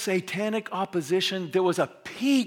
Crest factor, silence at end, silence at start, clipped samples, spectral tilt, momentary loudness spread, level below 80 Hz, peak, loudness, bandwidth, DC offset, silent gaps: 16 dB; 0 s; 0 s; under 0.1%; -4.5 dB/octave; 5 LU; -76 dBFS; -10 dBFS; -27 LUFS; 17 kHz; under 0.1%; none